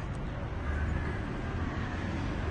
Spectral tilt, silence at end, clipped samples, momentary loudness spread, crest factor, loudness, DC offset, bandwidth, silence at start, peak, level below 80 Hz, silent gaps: -7 dB/octave; 0 s; under 0.1%; 4 LU; 12 dB; -35 LUFS; under 0.1%; 9.4 kHz; 0 s; -20 dBFS; -38 dBFS; none